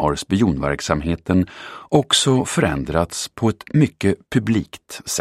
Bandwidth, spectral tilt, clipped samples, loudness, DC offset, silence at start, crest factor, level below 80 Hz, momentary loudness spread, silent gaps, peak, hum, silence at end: 15.5 kHz; -5 dB/octave; under 0.1%; -19 LUFS; under 0.1%; 0 s; 20 dB; -40 dBFS; 9 LU; none; 0 dBFS; none; 0 s